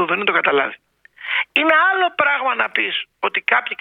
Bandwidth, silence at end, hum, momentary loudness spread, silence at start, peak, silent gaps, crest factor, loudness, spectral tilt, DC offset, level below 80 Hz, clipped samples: 5.4 kHz; 0.05 s; none; 8 LU; 0 s; 0 dBFS; none; 18 dB; -17 LUFS; -5 dB/octave; under 0.1%; -70 dBFS; under 0.1%